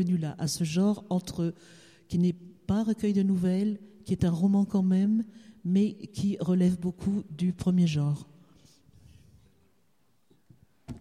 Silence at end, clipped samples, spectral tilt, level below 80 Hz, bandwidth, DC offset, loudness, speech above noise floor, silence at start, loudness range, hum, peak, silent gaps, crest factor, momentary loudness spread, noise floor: 0 s; under 0.1%; -7.5 dB/octave; -56 dBFS; 13 kHz; under 0.1%; -28 LUFS; 45 dB; 0 s; 5 LU; none; -14 dBFS; none; 14 dB; 9 LU; -72 dBFS